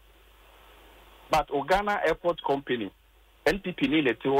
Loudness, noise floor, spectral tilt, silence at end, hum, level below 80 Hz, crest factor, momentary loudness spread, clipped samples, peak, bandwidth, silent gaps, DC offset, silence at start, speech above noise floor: -27 LUFS; -56 dBFS; -5 dB/octave; 0 s; none; -50 dBFS; 16 dB; 6 LU; under 0.1%; -12 dBFS; 16 kHz; none; under 0.1%; 1.3 s; 30 dB